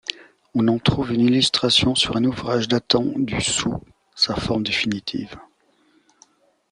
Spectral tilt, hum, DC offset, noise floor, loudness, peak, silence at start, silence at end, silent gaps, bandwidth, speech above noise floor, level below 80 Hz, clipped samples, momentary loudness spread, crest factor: -4 dB/octave; none; under 0.1%; -60 dBFS; -20 LUFS; -2 dBFS; 0.1 s; 1.3 s; none; 11 kHz; 40 dB; -46 dBFS; under 0.1%; 11 LU; 20 dB